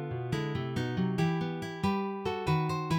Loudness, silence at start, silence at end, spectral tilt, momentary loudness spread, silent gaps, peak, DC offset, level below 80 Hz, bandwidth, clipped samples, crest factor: -32 LUFS; 0 s; 0 s; -7 dB/octave; 4 LU; none; -16 dBFS; under 0.1%; -58 dBFS; 15.5 kHz; under 0.1%; 14 dB